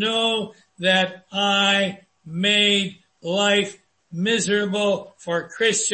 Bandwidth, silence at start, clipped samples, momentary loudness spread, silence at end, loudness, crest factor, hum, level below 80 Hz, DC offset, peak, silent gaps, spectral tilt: 8.8 kHz; 0 s; under 0.1%; 13 LU; 0 s; -20 LUFS; 16 dB; none; -66 dBFS; under 0.1%; -6 dBFS; none; -3 dB/octave